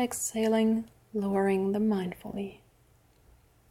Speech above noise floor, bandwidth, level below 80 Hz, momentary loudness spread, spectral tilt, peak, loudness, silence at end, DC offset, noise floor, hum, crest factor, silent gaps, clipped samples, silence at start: 35 dB; 16 kHz; -62 dBFS; 12 LU; -5.5 dB/octave; -16 dBFS; -29 LUFS; 1.15 s; under 0.1%; -63 dBFS; none; 14 dB; none; under 0.1%; 0 s